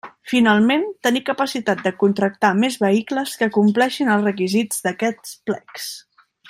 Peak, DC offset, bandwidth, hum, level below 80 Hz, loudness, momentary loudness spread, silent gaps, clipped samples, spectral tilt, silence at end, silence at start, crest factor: -2 dBFS; under 0.1%; 16 kHz; none; -66 dBFS; -19 LUFS; 11 LU; none; under 0.1%; -4.5 dB/octave; 0.5 s; 0.05 s; 16 dB